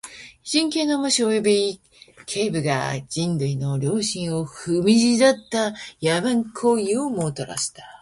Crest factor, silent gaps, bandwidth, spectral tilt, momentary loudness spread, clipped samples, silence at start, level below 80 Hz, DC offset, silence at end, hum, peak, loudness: 20 dB; none; 11.5 kHz; -4.5 dB/octave; 9 LU; under 0.1%; 0.05 s; -58 dBFS; under 0.1%; 0.05 s; none; -2 dBFS; -22 LUFS